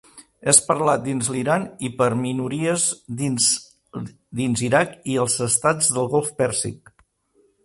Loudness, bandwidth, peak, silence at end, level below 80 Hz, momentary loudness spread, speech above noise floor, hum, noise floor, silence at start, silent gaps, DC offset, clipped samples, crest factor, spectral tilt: -20 LUFS; 12 kHz; 0 dBFS; 0.9 s; -58 dBFS; 13 LU; 41 dB; none; -63 dBFS; 0.15 s; none; under 0.1%; under 0.1%; 22 dB; -3.5 dB/octave